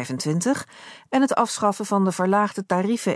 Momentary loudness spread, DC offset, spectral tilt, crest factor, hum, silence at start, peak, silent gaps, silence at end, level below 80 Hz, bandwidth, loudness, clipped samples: 6 LU; under 0.1%; -5 dB/octave; 16 dB; none; 0 s; -6 dBFS; none; 0 s; -70 dBFS; 11 kHz; -22 LUFS; under 0.1%